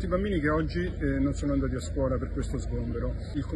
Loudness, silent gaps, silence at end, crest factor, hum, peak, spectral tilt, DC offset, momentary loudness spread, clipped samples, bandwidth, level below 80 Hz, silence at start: -30 LUFS; none; 0 s; 14 dB; none; -14 dBFS; -7.5 dB/octave; under 0.1%; 6 LU; under 0.1%; 10.5 kHz; -34 dBFS; 0 s